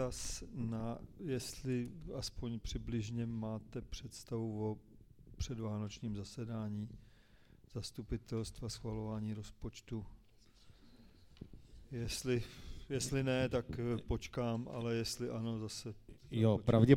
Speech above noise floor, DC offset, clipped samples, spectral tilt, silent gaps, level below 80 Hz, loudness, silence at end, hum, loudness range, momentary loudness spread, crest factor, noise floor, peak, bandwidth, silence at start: 26 dB; under 0.1%; under 0.1%; -6 dB/octave; none; -54 dBFS; -41 LUFS; 0 s; none; 7 LU; 14 LU; 28 dB; -64 dBFS; -12 dBFS; 16 kHz; 0 s